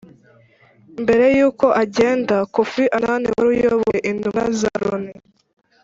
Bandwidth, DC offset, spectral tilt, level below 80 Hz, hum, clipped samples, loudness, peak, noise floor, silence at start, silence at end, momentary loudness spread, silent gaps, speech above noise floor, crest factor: 7.8 kHz; under 0.1%; -5.5 dB/octave; -52 dBFS; none; under 0.1%; -18 LUFS; -2 dBFS; -52 dBFS; 0.95 s; 0.7 s; 9 LU; none; 35 dB; 16 dB